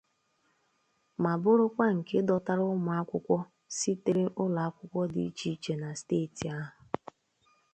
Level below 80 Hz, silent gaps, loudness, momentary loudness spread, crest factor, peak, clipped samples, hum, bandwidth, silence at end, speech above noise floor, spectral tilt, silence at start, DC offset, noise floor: -68 dBFS; none; -31 LUFS; 13 LU; 20 dB; -12 dBFS; under 0.1%; none; 9 kHz; 1.05 s; 44 dB; -6 dB/octave; 1.2 s; under 0.1%; -74 dBFS